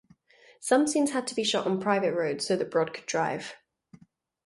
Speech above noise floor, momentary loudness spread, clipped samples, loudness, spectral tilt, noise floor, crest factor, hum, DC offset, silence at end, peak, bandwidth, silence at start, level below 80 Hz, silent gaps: 32 dB; 7 LU; under 0.1%; -27 LUFS; -4 dB/octave; -59 dBFS; 20 dB; none; under 0.1%; 0.5 s; -10 dBFS; 11.5 kHz; 0.6 s; -74 dBFS; none